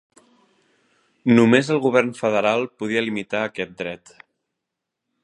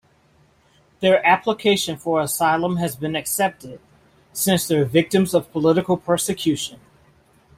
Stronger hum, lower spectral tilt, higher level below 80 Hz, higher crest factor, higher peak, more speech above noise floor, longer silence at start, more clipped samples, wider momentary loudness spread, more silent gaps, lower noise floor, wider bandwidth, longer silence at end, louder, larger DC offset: neither; first, -6 dB/octave vs -4.5 dB/octave; second, -66 dBFS vs -56 dBFS; about the same, 20 dB vs 18 dB; about the same, -2 dBFS vs -4 dBFS; first, 62 dB vs 38 dB; first, 1.25 s vs 1 s; neither; first, 13 LU vs 7 LU; neither; first, -82 dBFS vs -57 dBFS; second, 10.5 kHz vs 16 kHz; first, 1.25 s vs 0.8 s; about the same, -20 LUFS vs -20 LUFS; neither